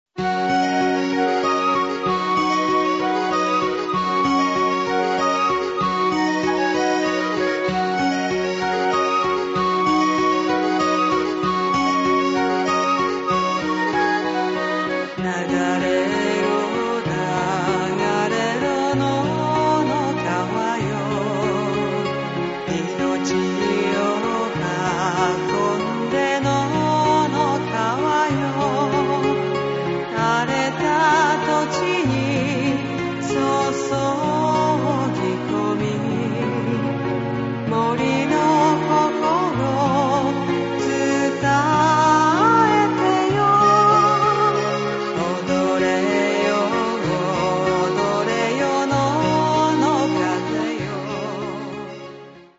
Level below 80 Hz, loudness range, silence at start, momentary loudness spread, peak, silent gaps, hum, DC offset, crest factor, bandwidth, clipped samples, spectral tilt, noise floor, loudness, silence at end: -50 dBFS; 4 LU; 0.15 s; 6 LU; -4 dBFS; none; none; under 0.1%; 14 dB; 8 kHz; under 0.1%; -5.5 dB/octave; -40 dBFS; -20 LUFS; 0.15 s